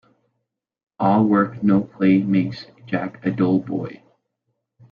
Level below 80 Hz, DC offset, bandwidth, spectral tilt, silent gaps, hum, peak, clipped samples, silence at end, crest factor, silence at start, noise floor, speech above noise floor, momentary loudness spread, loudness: -58 dBFS; under 0.1%; 5.2 kHz; -10 dB/octave; none; none; -6 dBFS; under 0.1%; 0.95 s; 16 dB; 1 s; -78 dBFS; 59 dB; 12 LU; -20 LUFS